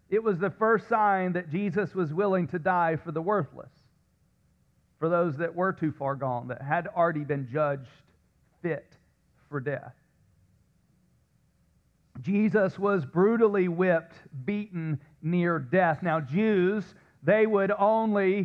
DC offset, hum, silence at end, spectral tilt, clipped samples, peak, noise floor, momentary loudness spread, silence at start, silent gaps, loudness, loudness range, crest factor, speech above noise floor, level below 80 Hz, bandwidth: under 0.1%; none; 0 s; -9.5 dB/octave; under 0.1%; -10 dBFS; -67 dBFS; 10 LU; 0.1 s; none; -27 LUFS; 12 LU; 16 dB; 41 dB; -68 dBFS; 6.6 kHz